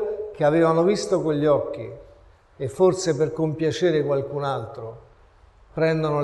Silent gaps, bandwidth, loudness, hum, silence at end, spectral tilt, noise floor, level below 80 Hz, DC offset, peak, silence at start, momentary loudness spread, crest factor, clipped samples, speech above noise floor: none; 11.5 kHz; -22 LUFS; none; 0 s; -6.5 dB/octave; -53 dBFS; -54 dBFS; under 0.1%; -8 dBFS; 0 s; 16 LU; 16 dB; under 0.1%; 31 dB